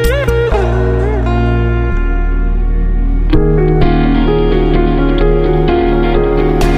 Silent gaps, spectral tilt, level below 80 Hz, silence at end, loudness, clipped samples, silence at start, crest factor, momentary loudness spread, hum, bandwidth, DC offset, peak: none; -8 dB/octave; -14 dBFS; 0 s; -13 LUFS; under 0.1%; 0 s; 10 dB; 5 LU; none; 14.5 kHz; under 0.1%; 0 dBFS